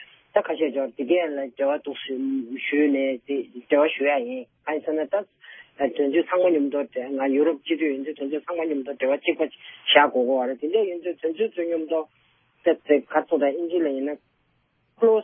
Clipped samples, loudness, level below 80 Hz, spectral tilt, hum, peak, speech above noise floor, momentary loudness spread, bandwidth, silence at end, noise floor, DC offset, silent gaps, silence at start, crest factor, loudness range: under 0.1%; -24 LUFS; -80 dBFS; -8 dB/octave; none; -2 dBFS; 45 dB; 9 LU; 3.7 kHz; 0 s; -68 dBFS; under 0.1%; none; 0 s; 22 dB; 2 LU